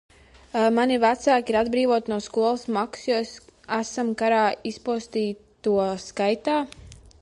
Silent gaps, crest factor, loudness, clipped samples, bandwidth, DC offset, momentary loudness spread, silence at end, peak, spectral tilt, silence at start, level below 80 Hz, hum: none; 16 dB; -24 LUFS; under 0.1%; 11.5 kHz; under 0.1%; 9 LU; 0.25 s; -8 dBFS; -4.5 dB/octave; 0.55 s; -56 dBFS; none